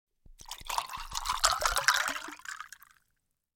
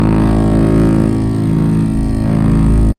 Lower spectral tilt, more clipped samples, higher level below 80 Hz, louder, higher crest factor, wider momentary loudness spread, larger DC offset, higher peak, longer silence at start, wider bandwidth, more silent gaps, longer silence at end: second, 0.5 dB/octave vs -9 dB/octave; neither; second, -50 dBFS vs -18 dBFS; second, -30 LUFS vs -13 LUFS; first, 30 dB vs 10 dB; first, 18 LU vs 4 LU; neither; about the same, -4 dBFS vs -2 dBFS; first, 0.3 s vs 0 s; first, 17 kHz vs 11 kHz; neither; first, 0.9 s vs 0.05 s